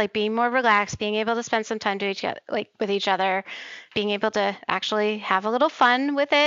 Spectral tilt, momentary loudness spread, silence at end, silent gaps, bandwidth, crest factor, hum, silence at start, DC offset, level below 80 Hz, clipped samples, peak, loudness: -3.5 dB/octave; 9 LU; 0 s; none; 7.8 kHz; 20 dB; none; 0 s; under 0.1%; -64 dBFS; under 0.1%; -4 dBFS; -23 LUFS